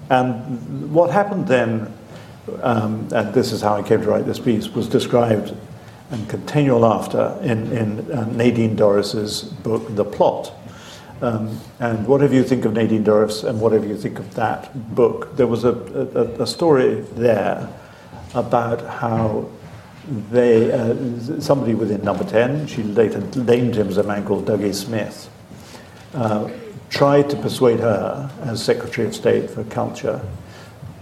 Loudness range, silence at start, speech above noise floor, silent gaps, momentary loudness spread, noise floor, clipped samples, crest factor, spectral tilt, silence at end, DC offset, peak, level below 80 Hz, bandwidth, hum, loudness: 3 LU; 0 s; 21 dB; none; 17 LU; -40 dBFS; under 0.1%; 18 dB; -6.5 dB/octave; 0 s; under 0.1%; -2 dBFS; -52 dBFS; 15 kHz; none; -19 LUFS